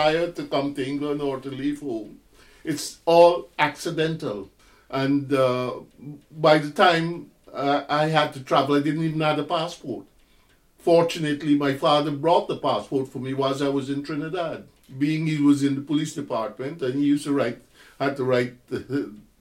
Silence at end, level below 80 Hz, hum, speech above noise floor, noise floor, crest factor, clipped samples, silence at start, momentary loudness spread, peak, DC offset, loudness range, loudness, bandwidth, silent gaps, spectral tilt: 0.2 s; -60 dBFS; none; 36 dB; -59 dBFS; 20 dB; under 0.1%; 0 s; 13 LU; -4 dBFS; under 0.1%; 3 LU; -23 LUFS; 15 kHz; none; -6 dB/octave